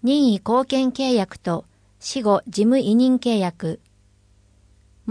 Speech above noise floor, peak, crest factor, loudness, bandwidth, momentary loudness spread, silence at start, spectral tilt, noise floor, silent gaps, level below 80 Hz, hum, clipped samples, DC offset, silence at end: 37 dB; -6 dBFS; 14 dB; -20 LUFS; 10.5 kHz; 13 LU; 0 s; -6 dB/octave; -57 dBFS; none; -58 dBFS; 50 Hz at -45 dBFS; under 0.1%; under 0.1%; 0 s